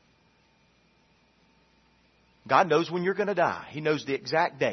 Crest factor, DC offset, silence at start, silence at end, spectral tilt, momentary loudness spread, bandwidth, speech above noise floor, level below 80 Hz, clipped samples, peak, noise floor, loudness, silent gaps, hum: 22 dB; under 0.1%; 2.45 s; 0 s; -5.5 dB/octave; 7 LU; 6.4 kHz; 39 dB; -72 dBFS; under 0.1%; -6 dBFS; -65 dBFS; -26 LUFS; none; none